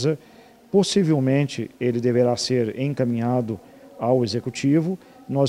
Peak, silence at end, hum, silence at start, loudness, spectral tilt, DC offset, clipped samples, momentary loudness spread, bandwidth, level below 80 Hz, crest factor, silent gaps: -6 dBFS; 0 s; none; 0 s; -22 LUFS; -6.5 dB/octave; under 0.1%; under 0.1%; 9 LU; 13.5 kHz; -64 dBFS; 16 dB; none